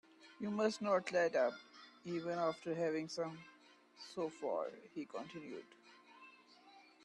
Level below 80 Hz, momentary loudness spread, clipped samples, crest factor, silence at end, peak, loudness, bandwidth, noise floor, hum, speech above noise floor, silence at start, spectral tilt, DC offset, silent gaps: -88 dBFS; 23 LU; under 0.1%; 18 dB; 0.25 s; -22 dBFS; -40 LUFS; 11.5 kHz; -64 dBFS; none; 24 dB; 0.2 s; -5 dB/octave; under 0.1%; none